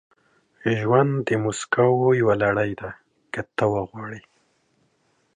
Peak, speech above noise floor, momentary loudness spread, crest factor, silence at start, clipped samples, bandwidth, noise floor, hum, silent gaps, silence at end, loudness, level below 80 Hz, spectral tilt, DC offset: -6 dBFS; 45 dB; 16 LU; 18 dB; 0.65 s; under 0.1%; 10.5 kHz; -67 dBFS; none; none; 1.15 s; -22 LUFS; -56 dBFS; -6.5 dB/octave; under 0.1%